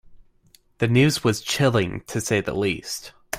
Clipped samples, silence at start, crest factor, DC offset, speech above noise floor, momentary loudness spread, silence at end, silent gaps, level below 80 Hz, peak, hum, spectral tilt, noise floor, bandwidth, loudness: under 0.1%; 0.1 s; 18 dB; under 0.1%; 36 dB; 10 LU; 0 s; none; -50 dBFS; -6 dBFS; none; -5 dB/octave; -58 dBFS; 16 kHz; -22 LUFS